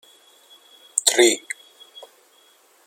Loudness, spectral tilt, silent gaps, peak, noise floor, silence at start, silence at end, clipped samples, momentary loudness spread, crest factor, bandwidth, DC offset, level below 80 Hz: -18 LUFS; 0.5 dB/octave; none; 0 dBFS; -56 dBFS; 0.95 s; 1.45 s; under 0.1%; 19 LU; 26 dB; 16.5 kHz; under 0.1%; -78 dBFS